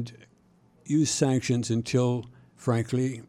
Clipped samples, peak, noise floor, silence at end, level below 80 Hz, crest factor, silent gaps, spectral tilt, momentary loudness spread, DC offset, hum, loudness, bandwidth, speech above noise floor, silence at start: under 0.1%; -8 dBFS; -61 dBFS; 0.05 s; -64 dBFS; 18 dB; none; -5.5 dB/octave; 9 LU; under 0.1%; none; -27 LUFS; 14 kHz; 35 dB; 0 s